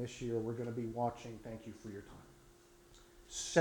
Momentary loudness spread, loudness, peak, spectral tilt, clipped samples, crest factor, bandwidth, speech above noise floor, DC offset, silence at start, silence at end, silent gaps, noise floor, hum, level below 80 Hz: 23 LU; -42 LUFS; -14 dBFS; -4.5 dB/octave; under 0.1%; 26 dB; 19 kHz; 24 dB; under 0.1%; 0 s; 0 s; none; -63 dBFS; none; -64 dBFS